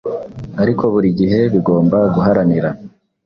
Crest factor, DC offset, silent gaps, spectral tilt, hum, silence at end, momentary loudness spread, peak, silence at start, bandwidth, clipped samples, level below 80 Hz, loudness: 14 dB; under 0.1%; none; -10.5 dB/octave; none; 0.35 s; 12 LU; 0 dBFS; 0.05 s; 6 kHz; under 0.1%; -44 dBFS; -14 LUFS